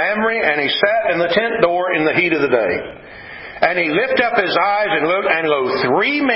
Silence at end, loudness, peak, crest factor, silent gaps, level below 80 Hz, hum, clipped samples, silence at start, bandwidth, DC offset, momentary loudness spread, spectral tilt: 0 s; -16 LUFS; 0 dBFS; 16 dB; none; -52 dBFS; none; under 0.1%; 0 s; 5.8 kHz; under 0.1%; 6 LU; -9 dB/octave